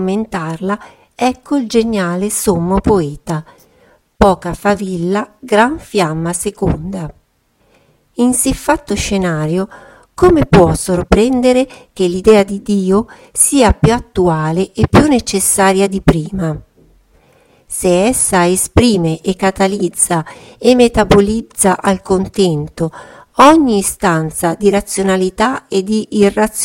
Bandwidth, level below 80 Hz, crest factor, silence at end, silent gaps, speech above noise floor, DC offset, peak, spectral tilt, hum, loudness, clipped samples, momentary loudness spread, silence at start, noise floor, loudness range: 17 kHz; -30 dBFS; 14 dB; 0 s; none; 45 dB; under 0.1%; 0 dBFS; -5 dB/octave; none; -13 LUFS; 0.3%; 10 LU; 0 s; -57 dBFS; 5 LU